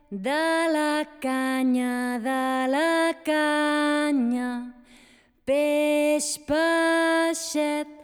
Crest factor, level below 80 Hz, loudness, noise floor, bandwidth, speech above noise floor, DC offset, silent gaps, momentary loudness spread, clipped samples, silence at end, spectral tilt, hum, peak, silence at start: 12 dB; -62 dBFS; -24 LUFS; -57 dBFS; 19.5 kHz; 33 dB; under 0.1%; none; 6 LU; under 0.1%; 0 s; -3 dB/octave; none; -12 dBFS; 0.1 s